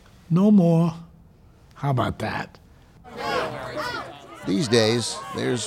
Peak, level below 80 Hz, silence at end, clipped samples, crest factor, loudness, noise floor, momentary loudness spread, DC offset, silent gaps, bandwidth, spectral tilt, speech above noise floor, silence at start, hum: -6 dBFS; -54 dBFS; 0 s; under 0.1%; 18 dB; -23 LUFS; -52 dBFS; 17 LU; under 0.1%; none; 13.5 kHz; -5.5 dB/octave; 31 dB; 0.3 s; none